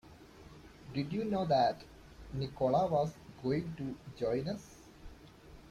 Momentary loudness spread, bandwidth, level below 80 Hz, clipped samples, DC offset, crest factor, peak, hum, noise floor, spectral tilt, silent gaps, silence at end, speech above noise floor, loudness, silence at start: 25 LU; 15 kHz; -58 dBFS; under 0.1%; under 0.1%; 18 dB; -18 dBFS; none; -55 dBFS; -7 dB/octave; none; 0 s; 22 dB; -35 LUFS; 0.05 s